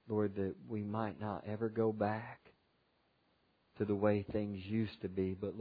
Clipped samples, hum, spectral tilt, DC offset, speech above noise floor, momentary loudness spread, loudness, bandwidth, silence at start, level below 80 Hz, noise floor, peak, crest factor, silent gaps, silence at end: under 0.1%; none; -7.5 dB/octave; under 0.1%; 39 dB; 9 LU; -38 LUFS; 5 kHz; 0.05 s; -70 dBFS; -76 dBFS; -18 dBFS; 20 dB; none; 0 s